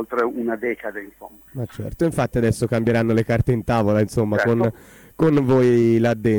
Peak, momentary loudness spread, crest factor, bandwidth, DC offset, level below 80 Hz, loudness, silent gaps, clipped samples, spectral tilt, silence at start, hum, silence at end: -6 dBFS; 15 LU; 14 dB; 19 kHz; under 0.1%; -44 dBFS; -20 LUFS; none; under 0.1%; -7.5 dB/octave; 0 s; none; 0 s